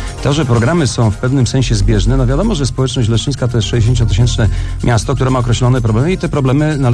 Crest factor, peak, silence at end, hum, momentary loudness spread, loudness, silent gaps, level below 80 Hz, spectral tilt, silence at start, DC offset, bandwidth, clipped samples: 10 dB; -2 dBFS; 0 s; none; 3 LU; -13 LUFS; none; -22 dBFS; -6 dB/octave; 0 s; under 0.1%; 11 kHz; under 0.1%